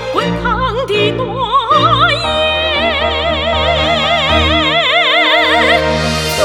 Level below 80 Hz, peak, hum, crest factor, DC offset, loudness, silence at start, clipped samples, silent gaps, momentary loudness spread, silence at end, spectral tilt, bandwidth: -30 dBFS; 0 dBFS; none; 12 dB; under 0.1%; -11 LUFS; 0 s; under 0.1%; none; 6 LU; 0 s; -4 dB/octave; 17 kHz